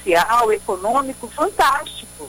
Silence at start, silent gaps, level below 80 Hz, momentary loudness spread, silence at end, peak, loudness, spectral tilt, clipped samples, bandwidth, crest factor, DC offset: 0 s; none; -46 dBFS; 9 LU; 0 s; -4 dBFS; -18 LUFS; -2.5 dB/octave; under 0.1%; 17 kHz; 16 dB; under 0.1%